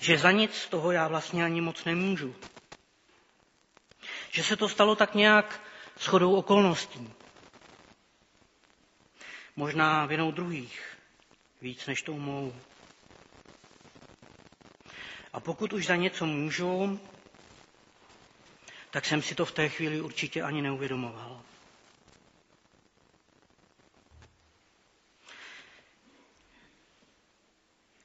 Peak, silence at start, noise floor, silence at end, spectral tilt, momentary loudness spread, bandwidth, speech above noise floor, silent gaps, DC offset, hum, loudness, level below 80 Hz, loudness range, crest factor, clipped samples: -4 dBFS; 0 s; -69 dBFS; 2.45 s; -3 dB/octave; 24 LU; 8 kHz; 41 dB; none; under 0.1%; none; -28 LUFS; -70 dBFS; 15 LU; 28 dB; under 0.1%